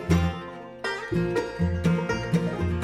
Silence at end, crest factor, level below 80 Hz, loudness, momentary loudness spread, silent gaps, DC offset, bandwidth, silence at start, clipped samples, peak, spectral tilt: 0 s; 16 dB; -40 dBFS; -27 LUFS; 8 LU; none; under 0.1%; 12.5 kHz; 0 s; under 0.1%; -10 dBFS; -7 dB/octave